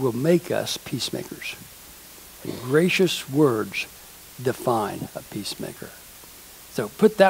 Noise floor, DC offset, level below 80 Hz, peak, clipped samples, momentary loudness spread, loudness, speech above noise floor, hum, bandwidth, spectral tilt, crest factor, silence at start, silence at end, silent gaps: -45 dBFS; under 0.1%; -58 dBFS; -2 dBFS; under 0.1%; 21 LU; -25 LUFS; 22 dB; none; 16 kHz; -5 dB/octave; 24 dB; 0 s; 0 s; none